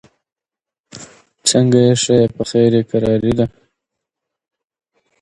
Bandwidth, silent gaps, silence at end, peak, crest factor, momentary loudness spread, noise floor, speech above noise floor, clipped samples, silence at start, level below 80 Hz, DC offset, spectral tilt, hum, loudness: 11.5 kHz; none; 1.75 s; 0 dBFS; 18 dB; 7 LU; -87 dBFS; 74 dB; under 0.1%; 0.95 s; -46 dBFS; under 0.1%; -5.5 dB/octave; none; -14 LUFS